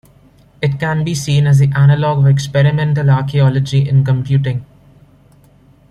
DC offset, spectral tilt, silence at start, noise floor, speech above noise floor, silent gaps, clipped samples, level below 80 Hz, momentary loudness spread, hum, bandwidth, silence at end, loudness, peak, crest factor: under 0.1%; -7 dB/octave; 0.6 s; -47 dBFS; 35 dB; none; under 0.1%; -44 dBFS; 7 LU; none; 10.5 kHz; 1.25 s; -13 LUFS; -2 dBFS; 12 dB